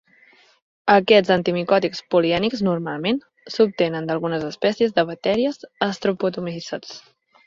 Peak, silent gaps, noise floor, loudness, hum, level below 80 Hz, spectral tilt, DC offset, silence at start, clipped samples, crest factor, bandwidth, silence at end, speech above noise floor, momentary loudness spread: -2 dBFS; none; -54 dBFS; -21 LUFS; none; -58 dBFS; -6 dB/octave; under 0.1%; 0.85 s; under 0.1%; 20 dB; 7.6 kHz; 0.45 s; 34 dB; 13 LU